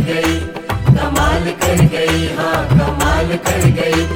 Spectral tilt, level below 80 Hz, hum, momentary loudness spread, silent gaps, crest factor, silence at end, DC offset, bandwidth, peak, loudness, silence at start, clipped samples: -5.5 dB/octave; -26 dBFS; none; 4 LU; none; 14 dB; 0 s; under 0.1%; 17 kHz; 0 dBFS; -15 LUFS; 0 s; under 0.1%